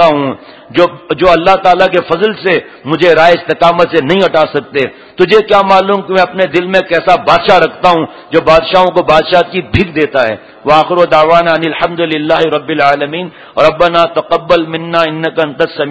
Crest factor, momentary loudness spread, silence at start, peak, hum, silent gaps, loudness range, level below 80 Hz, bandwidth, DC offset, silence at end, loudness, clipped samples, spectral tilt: 10 dB; 7 LU; 0 s; 0 dBFS; none; none; 2 LU; -38 dBFS; 8 kHz; 0.6%; 0 s; -10 LUFS; 2%; -6 dB/octave